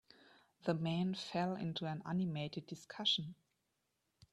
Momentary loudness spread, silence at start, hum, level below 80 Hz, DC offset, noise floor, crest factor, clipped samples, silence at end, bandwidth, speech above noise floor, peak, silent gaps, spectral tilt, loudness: 10 LU; 0.65 s; none; -78 dBFS; under 0.1%; -85 dBFS; 20 dB; under 0.1%; 1 s; 11 kHz; 45 dB; -22 dBFS; none; -6 dB/octave; -39 LUFS